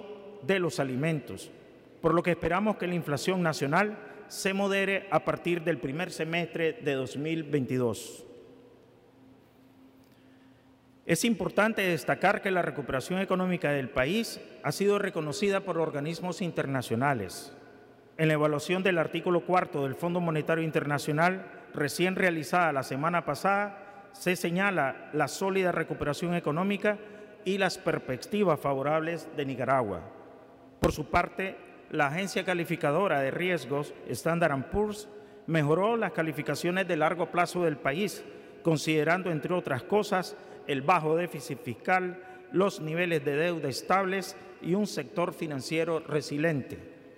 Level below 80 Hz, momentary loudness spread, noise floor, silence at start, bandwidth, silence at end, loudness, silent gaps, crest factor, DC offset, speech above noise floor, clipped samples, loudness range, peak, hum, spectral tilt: -58 dBFS; 10 LU; -59 dBFS; 0 s; 16 kHz; 0.05 s; -29 LUFS; none; 20 dB; under 0.1%; 30 dB; under 0.1%; 3 LU; -8 dBFS; none; -5.5 dB/octave